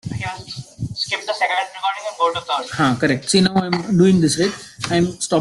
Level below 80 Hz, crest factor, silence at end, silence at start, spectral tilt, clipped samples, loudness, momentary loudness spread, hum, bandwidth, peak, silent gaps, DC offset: -50 dBFS; 16 dB; 0 s; 0.05 s; -4.5 dB/octave; under 0.1%; -19 LUFS; 13 LU; none; 12 kHz; -2 dBFS; none; under 0.1%